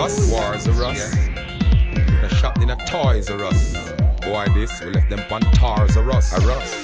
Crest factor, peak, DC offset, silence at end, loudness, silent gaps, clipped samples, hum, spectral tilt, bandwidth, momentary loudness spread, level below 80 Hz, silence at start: 14 dB; -4 dBFS; 0.2%; 0 s; -19 LUFS; none; under 0.1%; none; -6 dB/octave; 9.4 kHz; 5 LU; -20 dBFS; 0 s